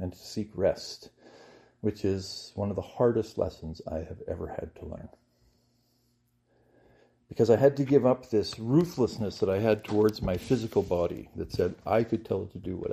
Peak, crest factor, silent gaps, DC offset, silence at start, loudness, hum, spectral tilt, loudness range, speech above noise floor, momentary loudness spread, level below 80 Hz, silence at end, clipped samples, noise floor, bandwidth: -8 dBFS; 20 dB; none; under 0.1%; 0 s; -29 LUFS; none; -7 dB/octave; 13 LU; 43 dB; 14 LU; -54 dBFS; 0 s; under 0.1%; -71 dBFS; 15 kHz